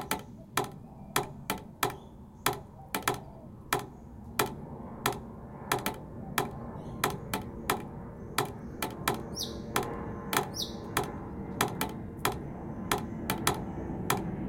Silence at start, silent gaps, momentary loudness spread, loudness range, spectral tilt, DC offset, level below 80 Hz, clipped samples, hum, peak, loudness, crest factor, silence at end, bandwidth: 0 s; none; 11 LU; 2 LU; -3.5 dB/octave; under 0.1%; -52 dBFS; under 0.1%; none; -8 dBFS; -34 LUFS; 28 dB; 0 s; 17 kHz